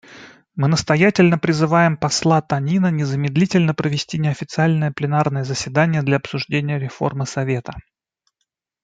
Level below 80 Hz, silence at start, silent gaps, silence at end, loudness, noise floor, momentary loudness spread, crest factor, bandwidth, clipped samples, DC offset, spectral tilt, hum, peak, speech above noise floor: -54 dBFS; 0.1 s; none; 1.05 s; -19 LUFS; -76 dBFS; 8 LU; 16 dB; 9.2 kHz; under 0.1%; under 0.1%; -6 dB/octave; none; -2 dBFS; 58 dB